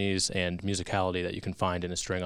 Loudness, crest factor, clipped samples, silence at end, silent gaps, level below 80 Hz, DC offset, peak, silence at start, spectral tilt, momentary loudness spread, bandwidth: -31 LUFS; 20 dB; under 0.1%; 0 s; none; -52 dBFS; under 0.1%; -10 dBFS; 0 s; -4 dB/octave; 5 LU; 14 kHz